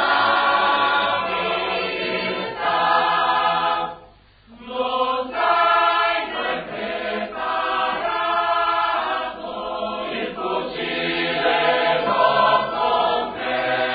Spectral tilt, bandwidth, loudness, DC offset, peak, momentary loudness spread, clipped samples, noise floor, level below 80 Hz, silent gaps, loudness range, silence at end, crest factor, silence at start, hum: -8 dB/octave; 5 kHz; -20 LUFS; under 0.1%; -4 dBFS; 9 LU; under 0.1%; -49 dBFS; -54 dBFS; none; 3 LU; 0 s; 16 dB; 0 s; none